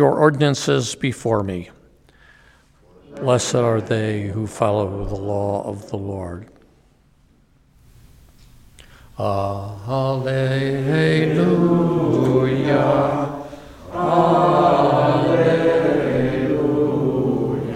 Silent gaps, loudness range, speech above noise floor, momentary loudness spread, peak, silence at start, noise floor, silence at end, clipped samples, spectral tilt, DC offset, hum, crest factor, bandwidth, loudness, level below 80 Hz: none; 13 LU; 37 dB; 13 LU; -2 dBFS; 0 s; -55 dBFS; 0 s; under 0.1%; -6.5 dB/octave; under 0.1%; none; 18 dB; 13.5 kHz; -19 LUFS; -46 dBFS